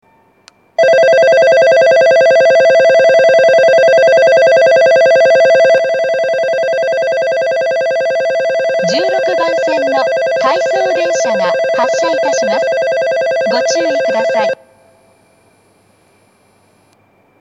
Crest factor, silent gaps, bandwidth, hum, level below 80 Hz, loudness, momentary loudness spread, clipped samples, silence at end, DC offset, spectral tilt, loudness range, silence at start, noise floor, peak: 10 dB; none; 10.5 kHz; none; -70 dBFS; -10 LUFS; 6 LU; under 0.1%; 2.85 s; under 0.1%; -3 dB/octave; 8 LU; 0.8 s; -51 dBFS; 0 dBFS